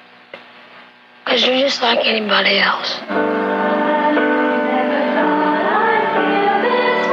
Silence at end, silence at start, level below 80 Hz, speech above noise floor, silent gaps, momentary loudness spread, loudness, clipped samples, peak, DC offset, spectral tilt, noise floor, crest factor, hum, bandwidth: 0 s; 0.35 s; -78 dBFS; 27 dB; none; 5 LU; -15 LUFS; under 0.1%; -2 dBFS; under 0.1%; -4 dB/octave; -43 dBFS; 14 dB; none; 7.8 kHz